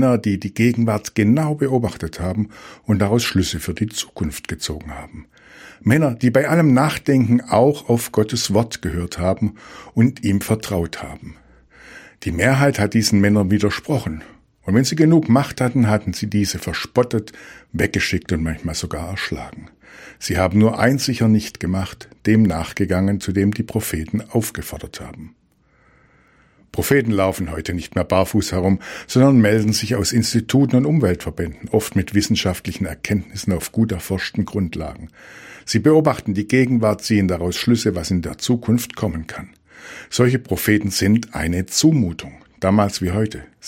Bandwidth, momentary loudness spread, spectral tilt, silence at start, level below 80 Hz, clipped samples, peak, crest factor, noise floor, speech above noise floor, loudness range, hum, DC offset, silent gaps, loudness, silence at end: 16.5 kHz; 12 LU; -5.5 dB/octave; 0 s; -42 dBFS; under 0.1%; 0 dBFS; 18 dB; -58 dBFS; 39 dB; 6 LU; none; under 0.1%; none; -19 LUFS; 0 s